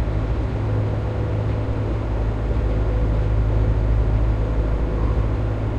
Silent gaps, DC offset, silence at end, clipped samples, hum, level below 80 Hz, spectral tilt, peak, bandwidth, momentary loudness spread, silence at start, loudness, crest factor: none; 0.1%; 0 s; under 0.1%; none; -22 dBFS; -9 dB/octave; -8 dBFS; 5.2 kHz; 3 LU; 0 s; -23 LUFS; 10 dB